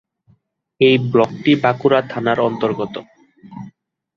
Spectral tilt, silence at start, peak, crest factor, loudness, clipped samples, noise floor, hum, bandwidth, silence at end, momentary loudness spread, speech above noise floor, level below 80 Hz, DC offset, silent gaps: -7.5 dB/octave; 0.8 s; -2 dBFS; 16 dB; -17 LUFS; under 0.1%; -59 dBFS; none; 7 kHz; 0.5 s; 20 LU; 43 dB; -58 dBFS; under 0.1%; none